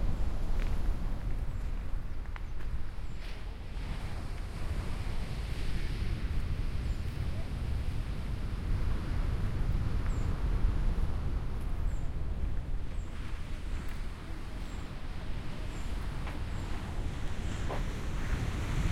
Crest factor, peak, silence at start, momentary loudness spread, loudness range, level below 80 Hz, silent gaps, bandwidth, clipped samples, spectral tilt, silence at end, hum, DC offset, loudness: 14 dB; -18 dBFS; 0 s; 8 LU; 6 LU; -34 dBFS; none; 12 kHz; under 0.1%; -6.5 dB/octave; 0 s; none; under 0.1%; -38 LUFS